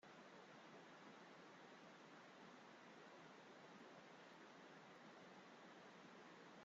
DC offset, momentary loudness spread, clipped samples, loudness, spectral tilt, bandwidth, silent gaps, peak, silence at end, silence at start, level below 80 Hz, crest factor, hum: under 0.1%; 1 LU; under 0.1%; -63 LUFS; -2.5 dB/octave; 7.6 kHz; none; -50 dBFS; 0 s; 0 s; under -90 dBFS; 12 dB; none